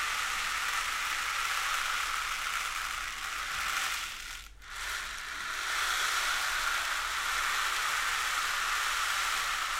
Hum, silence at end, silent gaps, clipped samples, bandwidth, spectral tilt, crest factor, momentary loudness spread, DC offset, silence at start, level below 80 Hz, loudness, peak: none; 0 s; none; under 0.1%; 16 kHz; 1.5 dB/octave; 16 dB; 7 LU; under 0.1%; 0 s; -52 dBFS; -31 LUFS; -16 dBFS